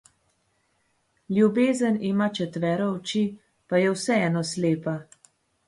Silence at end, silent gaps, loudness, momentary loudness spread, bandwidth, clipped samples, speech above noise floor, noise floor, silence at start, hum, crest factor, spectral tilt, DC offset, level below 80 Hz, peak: 0.65 s; none; -25 LUFS; 7 LU; 11.5 kHz; under 0.1%; 46 dB; -70 dBFS; 1.3 s; none; 16 dB; -6 dB/octave; under 0.1%; -68 dBFS; -8 dBFS